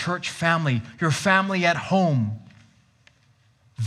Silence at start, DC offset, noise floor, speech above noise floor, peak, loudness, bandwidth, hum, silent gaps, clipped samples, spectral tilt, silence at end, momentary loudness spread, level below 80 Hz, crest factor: 0 s; under 0.1%; -61 dBFS; 38 dB; -4 dBFS; -22 LUFS; 13 kHz; none; none; under 0.1%; -5.5 dB/octave; 0 s; 7 LU; -66 dBFS; 20 dB